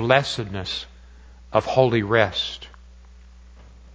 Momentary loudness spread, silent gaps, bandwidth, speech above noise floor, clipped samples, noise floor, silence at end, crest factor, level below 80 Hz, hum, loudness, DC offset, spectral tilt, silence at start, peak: 17 LU; none; 8 kHz; 25 dB; under 0.1%; -46 dBFS; 0 s; 24 dB; -46 dBFS; none; -22 LUFS; under 0.1%; -5.5 dB/octave; 0 s; 0 dBFS